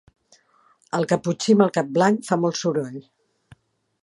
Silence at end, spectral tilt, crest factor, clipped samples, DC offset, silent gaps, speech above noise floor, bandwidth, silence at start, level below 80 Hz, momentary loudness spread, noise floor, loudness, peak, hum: 1 s; -5.5 dB/octave; 22 dB; under 0.1%; under 0.1%; none; 40 dB; 11.5 kHz; 0.95 s; -68 dBFS; 11 LU; -60 dBFS; -21 LUFS; -2 dBFS; none